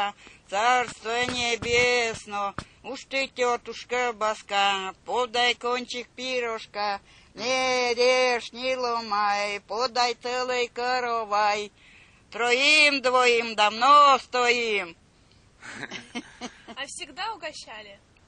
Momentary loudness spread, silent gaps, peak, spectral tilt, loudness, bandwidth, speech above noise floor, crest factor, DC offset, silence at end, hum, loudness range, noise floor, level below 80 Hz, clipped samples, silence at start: 18 LU; none; -6 dBFS; -1.5 dB/octave; -24 LUFS; 10 kHz; 33 dB; 20 dB; under 0.1%; 0.3 s; none; 7 LU; -58 dBFS; -60 dBFS; under 0.1%; 0 s